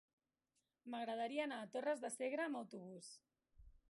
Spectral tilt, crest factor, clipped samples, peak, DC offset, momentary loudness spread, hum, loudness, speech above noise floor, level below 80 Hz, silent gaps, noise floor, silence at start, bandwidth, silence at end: -3.5 dB/octave; 18 dB; under 0.1%; -30 dBFS; under 0.1%; 15 LU; none; -45 LUFS; 44 dB; -76 dBFS; none; -89 dBFS; 0.85 s; 11.5 kHz; 0.15 s